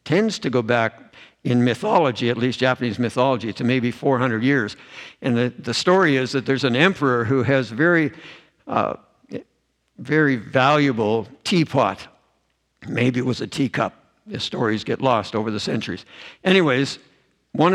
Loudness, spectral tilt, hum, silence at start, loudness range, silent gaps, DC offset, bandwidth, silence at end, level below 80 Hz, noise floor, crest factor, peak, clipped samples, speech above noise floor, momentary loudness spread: -20 LUFS; -6 dB/octave; none; 0.05 s; 4 LU; none; under 0.1%; 11.5 kHz; 0 s; -62 dBFS; -68 dBFS; 20 dB; 0 dBFS; under 0.1%; 48 dB; 14 LU